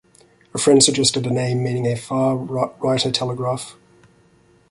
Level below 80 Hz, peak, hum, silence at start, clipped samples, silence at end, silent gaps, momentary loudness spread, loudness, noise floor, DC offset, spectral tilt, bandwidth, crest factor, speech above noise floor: -56 dBFS; 0 dBFS; none; 0.55 s; under 0.1%; 1 s; none; 12 LU; -19 LUFS; -55 dBFS; under 0.1%; -4 dB/octave; 11.5 kHz; 20 dB; 36 dB